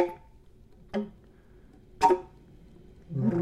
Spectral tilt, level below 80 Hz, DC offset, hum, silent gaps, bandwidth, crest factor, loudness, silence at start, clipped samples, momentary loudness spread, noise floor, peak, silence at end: -7 dB/octave; -56 dBFS; under 0.1%; none; none; 14.5 kHz; 24 dB; -29 LUFS; 0 s; under 0.1%; 21 LU; -55 dBFS; -8 dBFS; 0 s